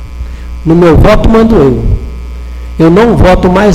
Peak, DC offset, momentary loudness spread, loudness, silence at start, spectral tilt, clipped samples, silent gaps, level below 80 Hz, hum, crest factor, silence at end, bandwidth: 0 dBFS; under 0.1%; 18 LU; -6 LUFS; 0 s; -8 dB/octave; 3%; none; -14 dBFS; none; 6 dB; 0 s; 14.5 kHz